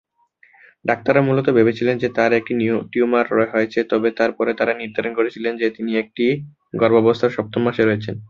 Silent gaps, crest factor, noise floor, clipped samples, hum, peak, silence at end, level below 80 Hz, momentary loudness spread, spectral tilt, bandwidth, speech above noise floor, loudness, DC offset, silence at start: none; 18 dB; -56 dBFS; under 0.1%; none; -2 dBFS; 0.05 s; -58 dBFS; 7 LU; -7.5 dB/octave; 7 kHz; 38 dB; -19 LUFS; under 0.1%; 0.85 s